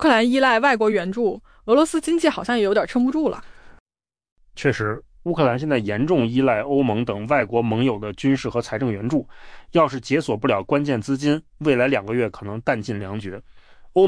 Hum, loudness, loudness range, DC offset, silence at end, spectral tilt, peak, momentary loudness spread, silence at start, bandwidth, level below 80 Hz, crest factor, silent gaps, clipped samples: none; -21 LUFS; 3 LU; under 0.1%; 0 s; -6 dB/octave; -6 dBFS; 9 LU; 0 s; 10.5 kHz; -50 dBFS; 16 dB; 3.80-3.86 s, 4.32-4.36 s; under 0.1%